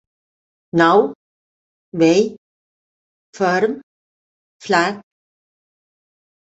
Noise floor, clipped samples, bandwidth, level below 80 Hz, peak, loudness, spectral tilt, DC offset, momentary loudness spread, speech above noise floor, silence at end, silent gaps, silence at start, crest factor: under -90 dBFS; under 0.1%; 8.2 kHz; -66 dBFS; -2 dBFS; -17 LUFS; -5.5 dB/octave; under 0.1%; 18 LU; over 75 dB; 1.5 s; 1.15-1.92 s, 2.38-3.33 s, 3.83-4.60 s; 0.75 s; 20 dB